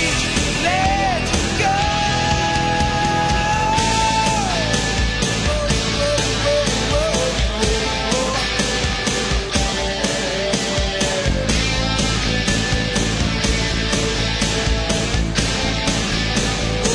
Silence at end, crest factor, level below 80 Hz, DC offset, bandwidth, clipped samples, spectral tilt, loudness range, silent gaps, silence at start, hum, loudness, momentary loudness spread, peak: 0 s; 16 dB; -26 dBFS; under 0.1%; 10.5 kHz; under 0.1%; -3.5 dB/octave; 2 LU; none; 0 s; none; -18 LUFS; 2 LU; -2 dBFS